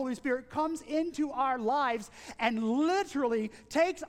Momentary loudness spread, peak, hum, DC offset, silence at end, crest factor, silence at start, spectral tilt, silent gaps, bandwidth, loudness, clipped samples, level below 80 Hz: 5 LU; -14 dBFS; none; under 0.1%; 0 s; 18 dB; 0 s; -4.5 dB/octave; none; 15 kHz; -31 LUFS; under 0.1%; -64 dBFS